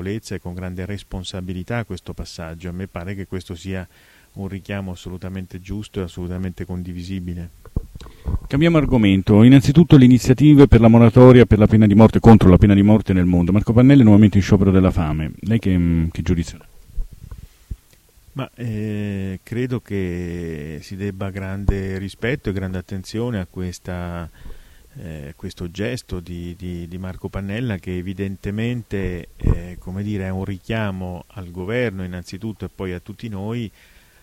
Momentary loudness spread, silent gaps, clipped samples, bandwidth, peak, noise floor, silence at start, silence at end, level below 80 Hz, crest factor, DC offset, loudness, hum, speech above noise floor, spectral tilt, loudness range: 21 LU; none; under 0.1%; 14 kHz; 0 dBFS; -52 dBFS; 0 s; 0.55 s; -32 dBFS; 18 dB; under 0.1%; -16 LUFS; none; 35 dB; -8 dB/octave; 19 LU